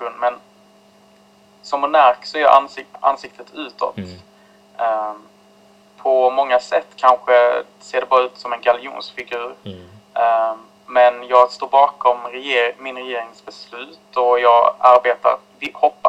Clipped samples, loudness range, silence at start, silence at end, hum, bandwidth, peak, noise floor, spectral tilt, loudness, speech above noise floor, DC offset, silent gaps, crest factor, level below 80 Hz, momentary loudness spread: under 0.1%; 4 LU; 0 s; 0 s; none; 8.8 kHz; 0 dBFS; -51 dBFS; -4 dB/octave; -17 LUFS; 34 dB; under 0.1%; none; 18 dB; -66 dBFS; 19 LU